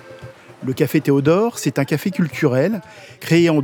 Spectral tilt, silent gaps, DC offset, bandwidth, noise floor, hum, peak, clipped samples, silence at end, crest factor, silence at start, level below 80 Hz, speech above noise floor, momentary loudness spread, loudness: -6.5 dB/octave; none; under 0.1%; 20 kHz; -39 dBFS; none; -2 dBFS; under 0.1%; 0 s; 16 dB; 0.05 s; -62 dBFS; 22 dB; 15 LU; -18 LUFS